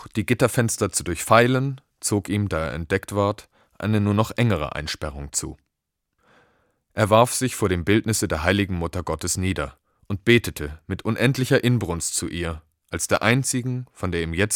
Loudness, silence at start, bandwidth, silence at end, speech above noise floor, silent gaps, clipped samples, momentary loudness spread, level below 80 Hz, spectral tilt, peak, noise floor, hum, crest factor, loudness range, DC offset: -22 LUFS; 0 s; 18.5 kHz; 0 s; 58 dB; none; under 0.1%; 11 LU; -44 dBFS; -4.5 dB/octave; 0 dBFS; -80 dBFS; none; 22 dB; 3 LU; under 0.1%